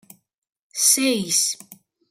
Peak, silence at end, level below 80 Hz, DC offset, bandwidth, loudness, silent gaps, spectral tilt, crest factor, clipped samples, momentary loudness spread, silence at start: -4 dBFS; 0.35 s; -74 dBFS; under 0.1%; 16 kHz; -18 LUFS; none; -1 dB/octave; 20 dB; under 0.1%; 17 LU; 0.75 s